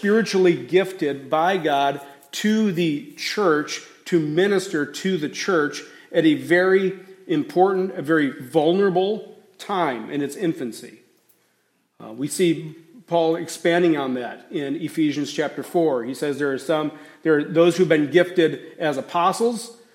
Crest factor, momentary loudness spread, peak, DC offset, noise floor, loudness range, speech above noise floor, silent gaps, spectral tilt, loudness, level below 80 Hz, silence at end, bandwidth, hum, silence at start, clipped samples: 18 dB; 11 LU; -4 dBFS; under 0.1%; -67 dBFS; 6 LU; 46 dB; none; -5.5 dB/octave; -21 LUFS; -74 dBFS; 0.2 s; 16 kHz; none; 0 s; under 0.1%